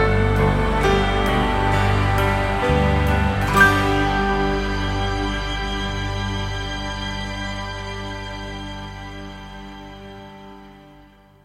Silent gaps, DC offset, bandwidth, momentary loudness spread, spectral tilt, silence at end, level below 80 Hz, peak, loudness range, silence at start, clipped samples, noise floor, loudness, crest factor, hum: none; under 0.1%; 16 kHz; 18 LU; -5.5 dB/octave; 0.55 s; -28 dBFS; -2 dBFS; 14 LU; 0 s; under 0.1%; -49 dBFS; -21 LUFS; 18 dB; 50 Hz at -30 dBFS